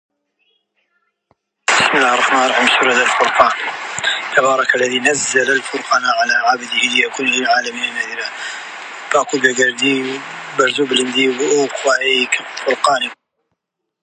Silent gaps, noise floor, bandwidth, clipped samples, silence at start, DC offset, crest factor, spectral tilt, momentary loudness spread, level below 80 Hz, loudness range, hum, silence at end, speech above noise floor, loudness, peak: none; -75 dBFS; 11 kHz; under 0.1%; 1.7 s; under 0.1%; 16 dB; -1.5 dB/octave; 10 LU; -64 dBFS; 3 LU; none; 0.9 s; 59 dB; -15 LUFS; 0 dBFS